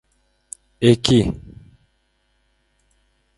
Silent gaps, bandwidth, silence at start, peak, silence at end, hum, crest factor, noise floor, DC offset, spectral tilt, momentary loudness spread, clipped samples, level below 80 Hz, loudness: none; 11.5 kHz; 0.8 s; 0 dBFS; 2 s; none; 22 dB; -66 dBFS; under 0.1%; -6 dB/octave; 24 LU; under 0.1%; -44 dBFS; -17 LUFS